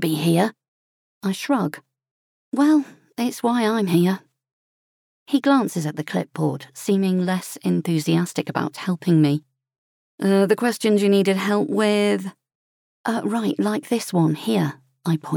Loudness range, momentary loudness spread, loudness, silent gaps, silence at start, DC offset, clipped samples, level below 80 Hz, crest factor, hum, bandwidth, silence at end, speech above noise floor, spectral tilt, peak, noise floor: 3 LU; 9 LU; -21 LUFS; 0.68-1.21 s, 2.11-2.52 s, 4.52-5.26 s, 9.78-10.18 s, 12.55-13.04 s; 0 s; under 0.1%; under 0.1%; -76 dBFS; 16 dB; none; 18.5 kHz; 0 s; over 70 dB; -6 dB/octave; -4 dBFS; under -90 dBFS